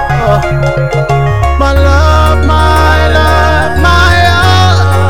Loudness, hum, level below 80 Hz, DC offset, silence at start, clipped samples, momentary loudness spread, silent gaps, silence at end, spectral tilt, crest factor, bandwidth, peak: -8 LUFS; none; -12 dBFS; 10%; 0 s; 3%; 4 LU; none; 0 s; -5.5 dB/octave; 8 dB; 16 kHz; 0 dBFS